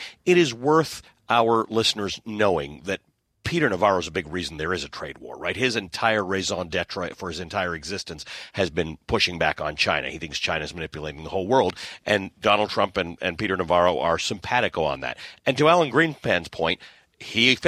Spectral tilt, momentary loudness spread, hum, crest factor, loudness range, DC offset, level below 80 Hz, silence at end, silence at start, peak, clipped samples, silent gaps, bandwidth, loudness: -4 dB/octave; 12 LU; none; 20 dB; 4 LU; under 0.1%; -50 dBFS; 0 s; 0 s; -4 dBFS; under 0.1%; none; 15 kHz; -24 LUFS